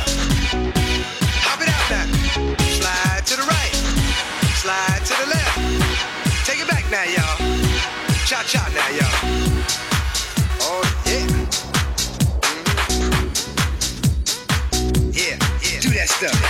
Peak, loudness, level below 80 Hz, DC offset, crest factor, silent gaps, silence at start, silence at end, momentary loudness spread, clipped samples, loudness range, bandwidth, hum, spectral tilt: -4 dBFS; -19 LUFS; -26 dBFS; under 0.1%; 14 dB; none; 0 s; 0 s; 3 LU; under 0.1%; 1 LU; 16.5 kHz; none; -3.5 dB/octave